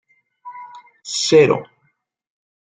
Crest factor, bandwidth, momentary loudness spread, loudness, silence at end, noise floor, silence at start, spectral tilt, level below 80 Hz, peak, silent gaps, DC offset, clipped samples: 18 dB; 9.4 kHz; 24 LU; -16 LUFS; 1 s; -67 dBFS; 0.45 s; -4 dB/octave; -62 dBFS; -2 dBFS; none; under 0.1%; under 0.1%